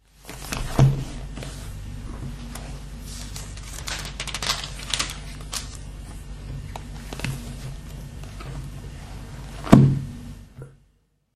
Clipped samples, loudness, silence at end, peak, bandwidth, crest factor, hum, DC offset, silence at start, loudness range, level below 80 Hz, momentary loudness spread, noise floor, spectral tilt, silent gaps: under 0.1%; -26 LUFS; 0.6 s; 0 dBFS; 13.5 kHz; 26 dB; none; under 0.1%; 0.2 s; 12 LU; -36 dBFS; 19 LU; -65 dBFS; -5.5 dB/octave; none